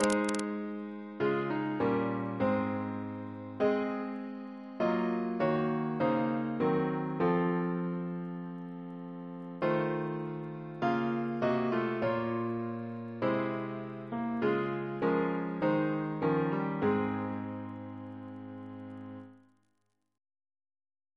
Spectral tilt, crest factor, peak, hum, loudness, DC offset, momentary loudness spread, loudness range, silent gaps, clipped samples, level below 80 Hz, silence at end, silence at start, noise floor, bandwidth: -7 dB/octave; 24 dB; -10 dBFS; none; -33 LUFS; under 0.1%; 13 LU; 5 LU; none; under 0.1%; -70 dBFS; 1.8 s; 0 s; -80 dBFS; 11 kHz